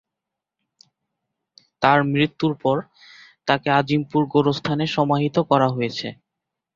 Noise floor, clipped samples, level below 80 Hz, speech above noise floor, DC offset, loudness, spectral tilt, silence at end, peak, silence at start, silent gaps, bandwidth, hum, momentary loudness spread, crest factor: -85 dBFS; under 0.1%; -60 dBFS; 65 dB; under 0.1%; -21 LUFS; -7 dB/octave; 0.65 s; 0 dBFS; 1.8 s; none; 7.4 kHz; none; 8 LU; 22 dB